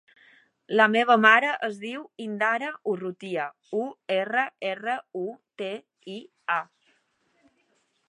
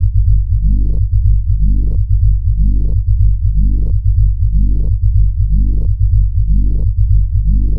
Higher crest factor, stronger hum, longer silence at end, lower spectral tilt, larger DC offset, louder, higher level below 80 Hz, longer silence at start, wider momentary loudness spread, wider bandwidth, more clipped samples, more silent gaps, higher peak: first, 24 dB vs 10 dB; neither; first, 1.45 s vs 0 s; second, -5 dB/octave vs -13 dB/octave; neither; second, -25 LUFS vs -15 LUFS; second, -84 dBFS vs -12 dBFS; first, 0.7 s vs 0 s; first, 18 LU vs 2 LU; first, 10.5 kHz vs 0.6 kHz; neither; neither; about the same, -2 dBFS vs 0 dBFS